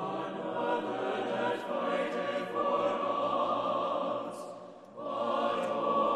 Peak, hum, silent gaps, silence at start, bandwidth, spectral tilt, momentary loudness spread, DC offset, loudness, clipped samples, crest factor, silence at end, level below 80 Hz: -18 dBFS; none; none; 0 s; 12 kHz; -5.5 dB/octave; 9 LU; under 0.1%; -32 LUFS; under 0.1%; 14 dB; 0 s; -80 dBFS